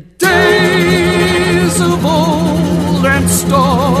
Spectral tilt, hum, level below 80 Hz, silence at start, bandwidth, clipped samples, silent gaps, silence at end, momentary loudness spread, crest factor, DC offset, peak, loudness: -5 dB/octave; none; -32 dBFS; 0.2 s; 14 kHz; under 0.1%; none; 0 s; 4 LU; 10 dB; under 0.1%; 0 dBFS; -11 LUFS